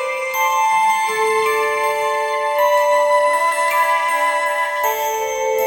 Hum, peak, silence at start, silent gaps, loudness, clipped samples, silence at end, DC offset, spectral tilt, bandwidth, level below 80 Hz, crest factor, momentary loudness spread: none; -6 dBFS; 0 s; none; -17 LUFS; under 0.1%; 0 s; under 0.1%; 0 dB/octave; 17 kHz; -62 dBFS; 12 dB; 4 LU